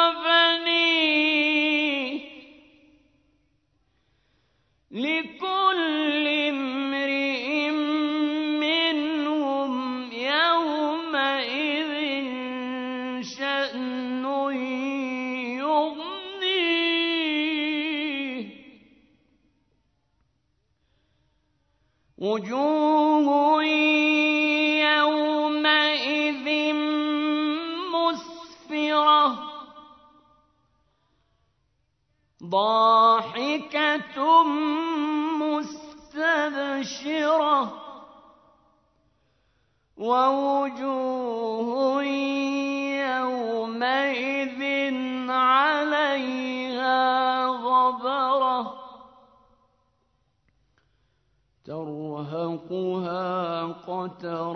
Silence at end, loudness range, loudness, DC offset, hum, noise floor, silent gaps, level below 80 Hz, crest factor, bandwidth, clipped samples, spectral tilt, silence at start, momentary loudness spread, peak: 0 s; 10 LU; -24 LUFS; under 0.1%; none; -72 dBFS; none; -72 dBFS; 20 dB; 6.4 kHz; under 0.1%; -4 dB/octave; 0 s; 12 LU; -6 dBFS